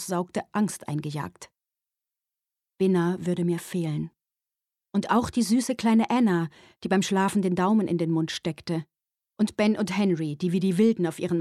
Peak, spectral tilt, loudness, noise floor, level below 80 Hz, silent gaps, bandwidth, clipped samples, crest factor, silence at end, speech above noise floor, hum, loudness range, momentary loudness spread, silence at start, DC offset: -10 dBFS; -6 dB/octave; -26 LUFS; -89 dBFS; -62 dBFS; none; 13.5 kHz; under 0.1%; 16 dB; 0 s; 64 dB; none; 6 LU; 9 LU; 0 s; under 0.1%